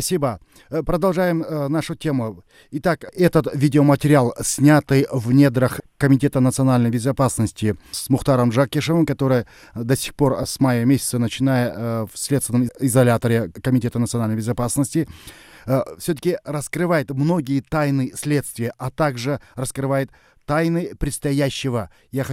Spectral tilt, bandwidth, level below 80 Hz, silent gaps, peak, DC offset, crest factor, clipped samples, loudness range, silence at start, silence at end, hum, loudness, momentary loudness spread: -6 dB/octave; 16 kHz; -44 dBFS; none; -2 dBFS; under 0.1%; 18 dB; under 0.1%; 6 LU; 0 s; 0 s; none; -20 LUFS; 10 LU